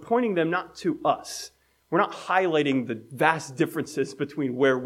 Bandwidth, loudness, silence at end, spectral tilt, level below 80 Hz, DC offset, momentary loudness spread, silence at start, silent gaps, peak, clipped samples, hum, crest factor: 16 kHz; -26 LUFS; 0 s; -5 dB/octave; -70 dBFS; under 0.1%; 7 LU; 0 s; none; -6 dBFS; under 0.1%; none; 20 dB